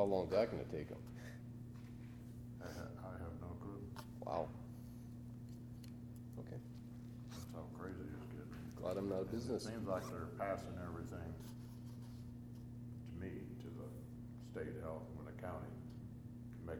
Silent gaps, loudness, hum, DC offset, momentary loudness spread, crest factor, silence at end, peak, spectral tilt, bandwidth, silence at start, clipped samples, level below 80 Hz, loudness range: none; -48 LUFS; none; under 0.1%; 10 LU; 22 dB; 0 s; -24 dBFS; -7 dB/octave; 19 kHz; 0 s; under 0.1%; -62 dBFS; 7 LU